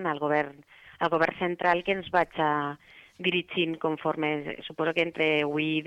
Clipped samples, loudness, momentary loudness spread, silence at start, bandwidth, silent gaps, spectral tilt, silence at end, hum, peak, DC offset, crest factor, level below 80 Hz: under 0.1%; -28 LUFS; 6 LU; 0 s; 8.8 kHz; none; -6.5 dB/octave; 0 s; none; -10 dBFS; under 0.1%; 18 dB; -66 dBFS